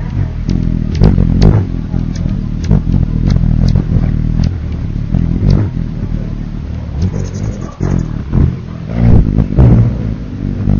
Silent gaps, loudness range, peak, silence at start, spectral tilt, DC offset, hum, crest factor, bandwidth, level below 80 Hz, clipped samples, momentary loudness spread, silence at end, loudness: none; 4 LU; 0 dBFS; 0 s; -9 dB/octave; under 0.1%; none; 12 dB; 7 kHz; -16 dBFS; 0.7%; 11 LU; 0 s; -14 LUFS